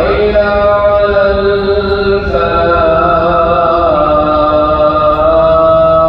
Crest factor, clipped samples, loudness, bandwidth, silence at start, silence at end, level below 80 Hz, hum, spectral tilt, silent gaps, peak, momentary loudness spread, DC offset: 8 dB; under 0.1%; -9 LUFS; 5.4 kHz; 0 s; 0 s; -24 dBFS; none; -8.5 dB/octave; none; 0 dBFS; 4 LU; under 0.1%